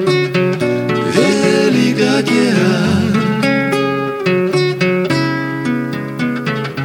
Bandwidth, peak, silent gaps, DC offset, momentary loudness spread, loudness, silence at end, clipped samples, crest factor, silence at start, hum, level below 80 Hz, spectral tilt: 17.5 kHz; 0 dBFS; none; under 0.1%; 6 LU; -14 LUFS; 0 s; under 0.1%; 14 dB; 0 s; none; -52 dBFS; -6 dB/octave